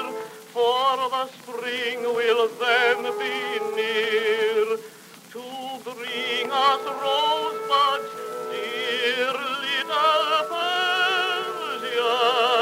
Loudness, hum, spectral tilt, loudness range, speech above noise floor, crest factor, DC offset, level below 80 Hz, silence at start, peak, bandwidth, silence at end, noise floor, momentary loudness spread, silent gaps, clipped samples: -23 LUFS; none; -1.5 dB/octave; 2 LU; 21 dB; 16 dB; under 0.1%; -84 dBFS; 0 s; -8 dBFS; 16 kHz; 0 s; -45 dBFS; 13 LU; none; under 0.1%